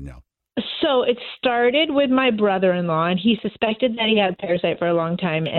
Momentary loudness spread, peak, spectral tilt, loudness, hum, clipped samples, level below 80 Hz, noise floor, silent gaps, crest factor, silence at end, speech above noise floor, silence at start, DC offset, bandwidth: 6 LU; -4 dBFS; -8.5 dB/octave; -20 LUFS; none; under 0.1%; -52 dBFS; -43 dBFS; none; 16 dB; 0 s; 23 dB; 0 s; under 0.1%; 4.4 kHz